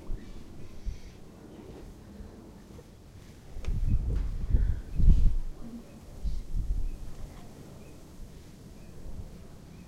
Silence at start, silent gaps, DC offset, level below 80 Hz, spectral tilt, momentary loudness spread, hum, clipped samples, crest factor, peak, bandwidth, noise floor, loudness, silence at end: 0 s; none; under 0.1%; -32 dBFS; -7.5 dB/octave; 20 LU; none; under 0.1%; 24 dB; -6 dBFS; 8.2 kHz; -50 dBFS; -34 LUFS; 0 s